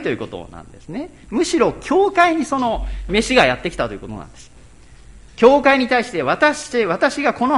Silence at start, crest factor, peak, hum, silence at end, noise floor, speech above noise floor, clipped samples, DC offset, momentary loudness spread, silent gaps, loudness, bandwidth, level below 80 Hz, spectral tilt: 0 s; 18 dB; 0 dBFS; none; 0 s; -43 dBFS; 25 dB; under 0.1%; under 0.1%; 17 LU; none; -17 LUFS; 11.5 kHz; -38 dBFS; -4.5 dB/octave